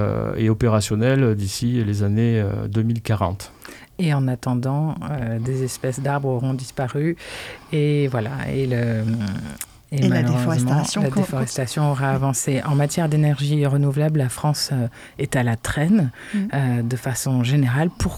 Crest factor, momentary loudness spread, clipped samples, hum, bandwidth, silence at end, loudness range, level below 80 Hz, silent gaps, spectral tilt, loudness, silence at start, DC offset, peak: 14 dB; 7 LU; under 0.1%; none; 15.5 kHz; 0 s; 3 LU; -44 dBFS; none; -6 dB/octave; -21 LUFS; 0 s; under 0.1%; -6 dBFS